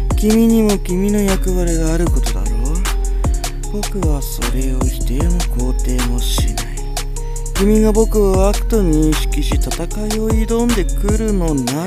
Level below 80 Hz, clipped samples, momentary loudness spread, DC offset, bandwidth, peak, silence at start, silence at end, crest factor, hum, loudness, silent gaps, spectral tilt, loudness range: -18 dBFS; under 0.1%; 9 LU; under 0.1%; 15.5 kHz; 0 dBFS; 0 s; 0 s; 14 dB; none; -17 LUFS; none; -5.5 dB/octave; 4 LU